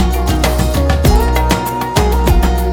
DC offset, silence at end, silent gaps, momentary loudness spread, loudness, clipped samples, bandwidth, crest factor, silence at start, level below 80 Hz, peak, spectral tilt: under 0.1%; 0 s; none; 3 LU; -14 LUFS; under 0.1%; 18.5 kHz; 12 dB; 0 s; -14 dBFS; 0 dBFS; -5.5 dB/octave